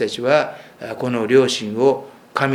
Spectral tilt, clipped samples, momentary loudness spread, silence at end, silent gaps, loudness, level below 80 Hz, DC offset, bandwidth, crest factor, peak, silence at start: -5 dB/octave; under 0.1%; 12 LU; 0 s; none; -19 LUFS; -66 dBFS; under 0.1%; 14.5 kHz; 18 dB; 0 dBFS; 0 s